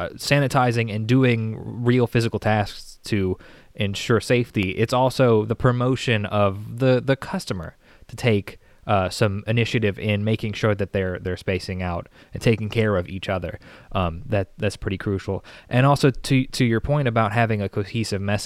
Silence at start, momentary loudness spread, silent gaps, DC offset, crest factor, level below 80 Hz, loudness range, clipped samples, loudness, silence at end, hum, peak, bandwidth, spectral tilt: 0 s; 10 LU; none; under 0.1%; 18 dB; -44 dBFS; 4 LU; under 0.1%; -22 LUFS; 0 s; none; -4 dBFS; 13.5 kHz; -6.5 dB/octave